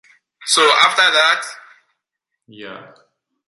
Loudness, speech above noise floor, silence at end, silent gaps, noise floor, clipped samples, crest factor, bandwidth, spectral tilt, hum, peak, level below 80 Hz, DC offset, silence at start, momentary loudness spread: -13 LUFS; 63 dB; 0.65 s; none; -79 dBFS; under 0.1%; 18 dB; 14 kHz; 1 dB/octave; none; 0 dBFS; -74 dBFS; under 0.1%; 0.4 s; 23 LU